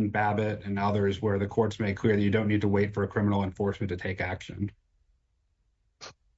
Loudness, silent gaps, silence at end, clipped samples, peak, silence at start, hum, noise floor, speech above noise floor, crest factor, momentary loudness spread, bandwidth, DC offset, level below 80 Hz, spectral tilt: -28 LUFS; none; 0.25 s; under 0.1%; -12 dBFS; 0 s; none; -72 dBFS; 45 dB; 18 dB; 11 LU; 8 kHz; under 0.1%; -58 dBFS; -7.5 dB/octave